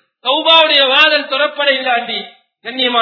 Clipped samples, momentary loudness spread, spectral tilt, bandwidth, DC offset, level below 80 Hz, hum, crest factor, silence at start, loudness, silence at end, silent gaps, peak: 0.2%; 15 LU; -2.5 dB/octave; 6 kHz; under 0.1%; -60 dBFS; none; 14 dB; 0.25 s; -11 LUFS; 0 s; none; 0 dBFS